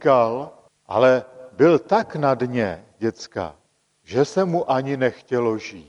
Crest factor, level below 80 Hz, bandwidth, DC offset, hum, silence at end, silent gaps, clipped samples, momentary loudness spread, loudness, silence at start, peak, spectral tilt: 18 dB; -60 dBFS; 10.5 kHz; under 0.1%; none; 0.05 s; none; under 0.1%; 13 LU; -21 LUFS; 0 s; -4 dBFS; -6.5 dB/octave